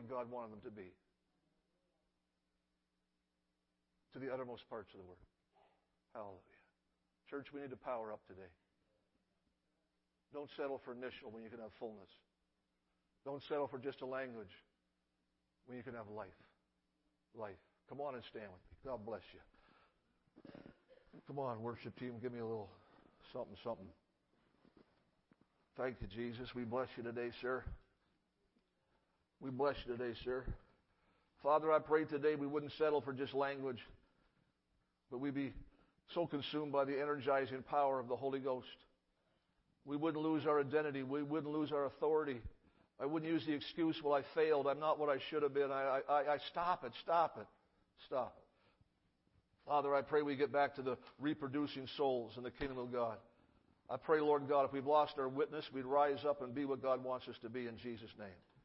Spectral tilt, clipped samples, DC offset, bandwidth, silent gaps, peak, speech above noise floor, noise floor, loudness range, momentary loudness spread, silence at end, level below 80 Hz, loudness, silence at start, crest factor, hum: -4 dB/octave; under 0.1%; under 0.1%; 5.6 kHz; none; -20 dBFS; 46 dB; -87 dBFS; 15 LU; 18 LU; 0.3 s; -68 dBFS; -40 LUFS; 0 s; 22 dB; none